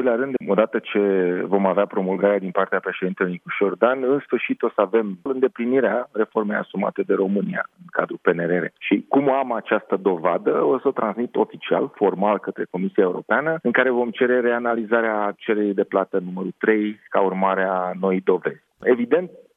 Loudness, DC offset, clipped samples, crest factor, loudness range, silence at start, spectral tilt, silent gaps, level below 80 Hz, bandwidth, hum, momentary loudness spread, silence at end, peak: -21 LUFS; under 0.1%; under 0.1%; 20 dB; 2 LU; 0 s; -9.5 dB/octave; none; -76 dBFS; 3.8 kHz; none; 5 LU; 0.15 s; -2 dBFS